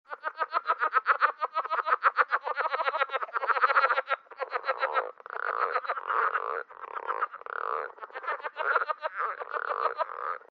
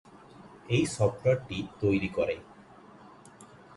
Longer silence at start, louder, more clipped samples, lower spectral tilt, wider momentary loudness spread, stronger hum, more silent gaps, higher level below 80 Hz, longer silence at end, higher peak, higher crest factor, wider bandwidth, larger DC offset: second, 0.1 s vs 0.4 s; about the same, -29 LUFS vs -29 LUFS; neither; second, 5 dB/octave vs -6 dB/octave; about the same, 11 LU vs 11 LU; neither; neither; second, under -90 dBFS vs -56 dBFS; first, 0.15 s vs 0 s; first, -8 dBFS vs -12 dBFS; about the same, 22 dB vs 20 dB; second, 5.4 kHz vs 11.5 kHz; neither